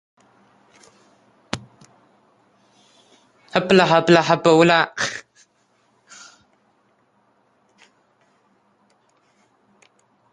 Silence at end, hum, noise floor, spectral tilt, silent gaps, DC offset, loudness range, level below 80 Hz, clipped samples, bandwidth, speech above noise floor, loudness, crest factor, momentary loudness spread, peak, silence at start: 5.1 s; none; -63 dBFS; -5 dB/octave; none; under 0.1%; 23 LU; -64 dBFS; under 0.1%; 11 kHz; 48 dB; -17 LUFS; 22 dB; 20 LU; -2 dBFS; 1.55 s